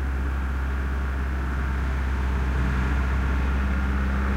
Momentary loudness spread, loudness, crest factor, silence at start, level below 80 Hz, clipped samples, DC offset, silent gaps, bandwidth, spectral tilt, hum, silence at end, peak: 3 LU; -26 LUFS; 10 dB; 0 s; -24 dBFS; under 0.1%; under 0.1%; none; 7.2 kHz; -7.5 dB/octave; none; 0 s; -14 dBFS